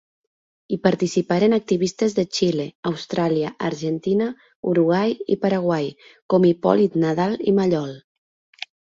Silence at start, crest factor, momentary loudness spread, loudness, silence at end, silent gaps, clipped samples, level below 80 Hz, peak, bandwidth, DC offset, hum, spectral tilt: 0.7 s; 20 dB; 9 LU; -21 LUFS; 0.8 s; 2.75-2.83 s, 4.56-4.63 s, 6.22-6.29 s; under 0.1%; -60 dBFS; -2 dBFS; 7.8 kHz; under 0.1%; none; -6.5 dB/octave